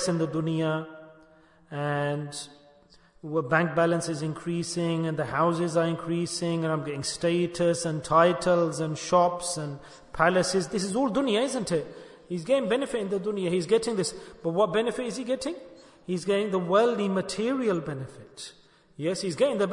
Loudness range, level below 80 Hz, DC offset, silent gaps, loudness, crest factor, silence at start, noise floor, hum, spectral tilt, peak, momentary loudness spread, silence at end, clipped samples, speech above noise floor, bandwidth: 4 LU; -60 dBFS; under 0.1%; none; -27 LUFS; 20 dB; 0 s; -58 dBFS; none; -5 dB/octave; -6 dBFS; 14 LU; 0 s; under 0.1%; 31 dB; 11 kHz